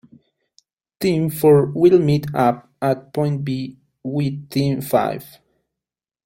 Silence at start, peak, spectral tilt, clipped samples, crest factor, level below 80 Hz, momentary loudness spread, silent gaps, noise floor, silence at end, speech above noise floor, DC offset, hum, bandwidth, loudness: 1 s; -2 dBFS; -7.5 dB/octave; under 0.1%; 18 dB; -56 dBFS; 12 LU; none; -88 dBFS; 1 s; 70 dB; under 0.1%; none; 16.5 kHz; -19 LUFS